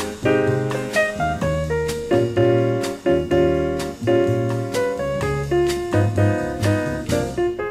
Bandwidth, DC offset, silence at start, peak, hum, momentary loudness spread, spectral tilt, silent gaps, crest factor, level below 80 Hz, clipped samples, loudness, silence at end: 15.5 kHz; under 0.1%; 0 s; -6 dBFS; none; 5 LU; -6.5 dB/octave; none; 14 dB; -40 dBFS; under 0.1%; -20 LUFS; 0 s